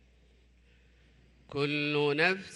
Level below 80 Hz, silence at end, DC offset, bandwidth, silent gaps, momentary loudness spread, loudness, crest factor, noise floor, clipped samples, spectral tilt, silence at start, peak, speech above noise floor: -64 dBFS; 0 s; under 0.1%; 11 kHz; none; 8 LU; -29 LUFS; 20 dB; -62 dBFS; under 0.1%; -5.5 dB/octave; 1.5 s; -14 dBFS; 33 dB